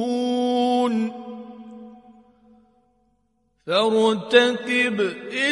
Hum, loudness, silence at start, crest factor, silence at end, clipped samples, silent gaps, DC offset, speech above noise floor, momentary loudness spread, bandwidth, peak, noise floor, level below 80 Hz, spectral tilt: none; -21 LUFS; 0 s; 22 dB; 0 s; under 0.1%; none; under 0.1%; 48 dB; 23 LU; 11.5 kHz; -2 dBFS; -68 dBFS; -70 dBFS; -4 dB/octave